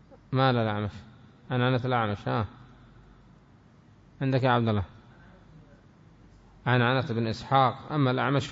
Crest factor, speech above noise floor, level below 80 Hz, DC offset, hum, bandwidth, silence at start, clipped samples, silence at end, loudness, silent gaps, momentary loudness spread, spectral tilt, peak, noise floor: 18 dB; 30 dB; -58 dBFS; under 0.1%; none; 7.8 kHz; 0.3 s; under 0.1%; 0 s; -27 LUFS; none; 9 LU; -7.5 dB/octave; -10 dBFS; -56 dBFS